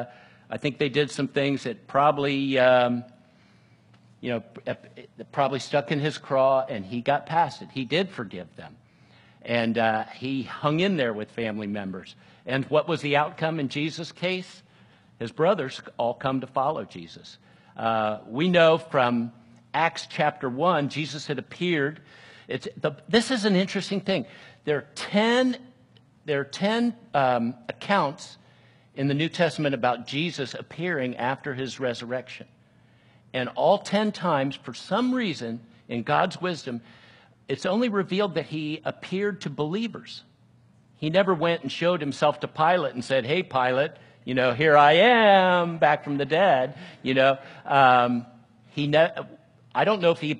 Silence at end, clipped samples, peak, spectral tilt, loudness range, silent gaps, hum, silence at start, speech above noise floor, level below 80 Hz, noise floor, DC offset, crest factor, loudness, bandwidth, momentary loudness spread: 0 s; under 0.1%; -4 dBFS; -5.5 dB/octave; 8 LU; none; none; 0 s; 33 dB; -70 dBFS; -58 dBFS; under 0.1%; 22 dB; -25 LUFS; 11.5 kHz; 14 LU